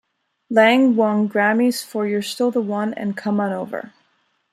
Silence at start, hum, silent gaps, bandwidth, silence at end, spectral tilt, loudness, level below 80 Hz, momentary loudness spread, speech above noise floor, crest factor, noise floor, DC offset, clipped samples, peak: 0.5 s; none; none; 14.5 kHz; 0.65 s; -5.5 dB/octave; -19 LUFS; -72 dBFS; 10 LU; 47 dB; 18 dB; -65 dBFS; under 0.1%; under 0.1%; -2 dBFS